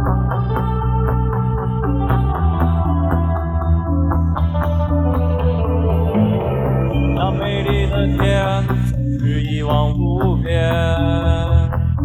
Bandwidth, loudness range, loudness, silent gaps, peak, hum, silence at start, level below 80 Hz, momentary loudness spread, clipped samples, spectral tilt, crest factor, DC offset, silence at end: 13 kHz; 1 LU; -18 LUFS; none; -2 dBFS; none; 0 s; -22 dBFS; 3 LU; under 0.1%; -8.5 dB/octave; 14 dB; under 0.1%; 0 s